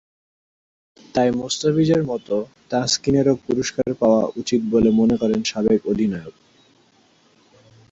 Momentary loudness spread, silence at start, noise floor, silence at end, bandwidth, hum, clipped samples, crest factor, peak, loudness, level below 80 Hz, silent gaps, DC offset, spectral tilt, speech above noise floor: 7 LU; 1.15 s; -57 dBFS; 1.6 s; 8 kHz; none; under 0.1%; 16 dB; -4 dBFS; -20 LUFS; -50 dBFS; none; under 0.1%; -5.5 dB/octave; 38 dB